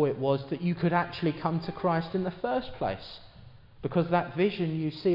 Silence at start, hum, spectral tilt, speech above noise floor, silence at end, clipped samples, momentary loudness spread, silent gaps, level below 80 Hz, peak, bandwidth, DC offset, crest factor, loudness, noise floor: 0 s; none; -9.5 dB/octave; 22 dB; 0 s; under 0.1%; 7 LU; none; -56 dBFS; -12 dBFS; 5.6 kHz; under 0.1%; 18 dB; -30 LUFS; -51 dBFS